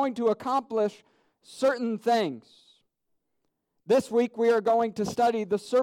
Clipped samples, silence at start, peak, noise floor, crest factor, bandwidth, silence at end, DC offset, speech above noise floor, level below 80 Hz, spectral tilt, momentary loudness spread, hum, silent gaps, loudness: under 0.1%; 0 s; -14 dBFS; -78 dBFS; 14 dB; 15.5 kHz; 0 s; under 0.1%; 52 dB; -70 dBFS; -5.5 dB/octave; 5 LU; none; none; -26 LUFS